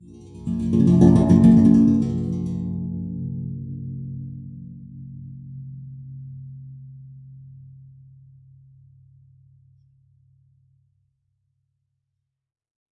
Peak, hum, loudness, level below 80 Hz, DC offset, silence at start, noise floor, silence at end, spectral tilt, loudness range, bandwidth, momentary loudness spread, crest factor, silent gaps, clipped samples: -2 dBFS; none; -19 LUFS; -46 dBFS; under 0.1%; 0.35 s; -79 dBFS; 5.6 s; -10 dB/octave; 25 LU; 9.4 kHz; 26 LU; 22 dB; none; under 0.1%